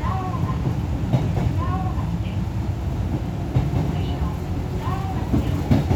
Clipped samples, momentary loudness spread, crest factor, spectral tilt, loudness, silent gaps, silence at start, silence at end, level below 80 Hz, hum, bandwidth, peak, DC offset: under 0.1%; 4 LU; 18 dB; -8 dB/octave; -24 LUFS; none; 0 s; 0 s; -30 dBFS; none; 16 kHz; -4 dBFS; under 0.1%